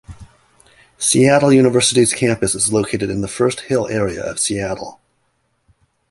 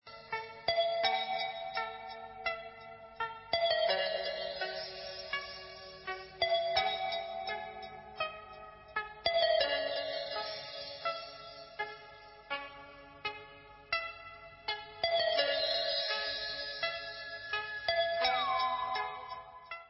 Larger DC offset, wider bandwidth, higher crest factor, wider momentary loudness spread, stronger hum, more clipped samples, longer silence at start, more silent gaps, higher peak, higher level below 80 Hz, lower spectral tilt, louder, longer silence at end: neither; first, 12 kHz vs 5.8 kHz; about the same, 16 dB vs 20 dB; second, 10 LU vs 17 LU; neither; neither; about the same, 0.1 s vs 0.05 s; neither; first, 0 dBFS vs -16 dBFS; first, -46 dBFS vs -66 dBFS; about the same, -4 dB/octave vs -5 dB/octave; first, -16 LUFS vs -35 LUFS; first, 1.2 s vs 0 s